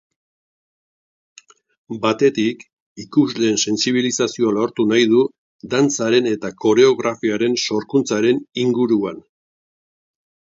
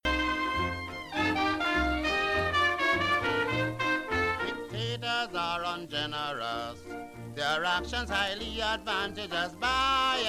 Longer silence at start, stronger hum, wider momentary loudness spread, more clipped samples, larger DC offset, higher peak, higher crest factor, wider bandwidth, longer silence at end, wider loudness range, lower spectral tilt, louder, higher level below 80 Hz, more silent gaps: first, 1.9 s vs 0.05 s; neither; about the same, 8 LU vs 9 LU; neither; neither; first, -2 dBFS vs -16 dBFS; about the same, 18 dB vs 16 dB; second, 7.8 kHz vs 15 kHz; first, 1.35 s vs 0 s; about the same, 4 LU vs 5 LU; about the same, -4 dB/octave vs -4 dB/octave; first, -18 LUFS vs -29 LUFS; second, -64 dBFS vs -46 dBFS; first, 2.73-2.96 s, 5.38-5.59 s vs none